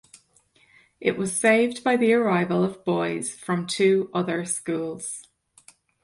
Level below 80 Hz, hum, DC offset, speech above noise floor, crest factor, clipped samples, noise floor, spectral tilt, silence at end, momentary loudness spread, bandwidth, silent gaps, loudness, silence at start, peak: -68 dBFS; none; under 0.1%; 38 dB; 20 dB; under 0.1%; -61 dBFS; -4.5 dB/octave; 0.8 s; 10 LU; 11.5 kHz; none; -24 LUFS; 1 s; -6 dBFS